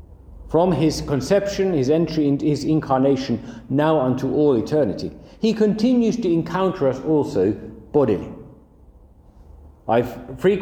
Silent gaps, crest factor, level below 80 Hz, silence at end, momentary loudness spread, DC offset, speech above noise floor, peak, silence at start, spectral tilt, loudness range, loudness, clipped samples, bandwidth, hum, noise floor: none; 16 dB; -46 dBFS; 0 s; 8 LU; under 0.1%; 29 dB; -4 dBFS; 0 s; -7 dB/octave; 4 LU; -20 LUFS; under 0.1%; 15.5 kHz; none; -48 dBFS